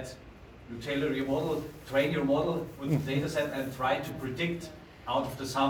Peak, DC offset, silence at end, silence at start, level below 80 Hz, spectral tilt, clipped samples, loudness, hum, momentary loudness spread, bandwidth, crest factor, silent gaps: -14 dBFS; under 0.1%; 0 s; 0 s; -56 dBFS; -6 dB/octave; under 0.1%; -31 LUFS; none; 16 LU; over 20 kHz; 18 dB; none